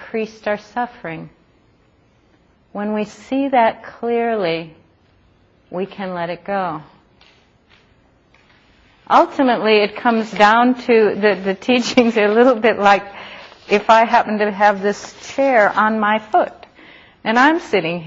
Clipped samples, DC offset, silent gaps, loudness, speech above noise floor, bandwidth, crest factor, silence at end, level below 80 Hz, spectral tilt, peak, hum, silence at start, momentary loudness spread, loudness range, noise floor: under 0.1%; under 0.1%; none; -16 LUFS; 39 dB; 8 kHz; 18 dB; 0 s; -58 dBFS; -5 dB/octave; 0 dBFS; none; 0 s; 14 LU; 14 LU; -55 dBFS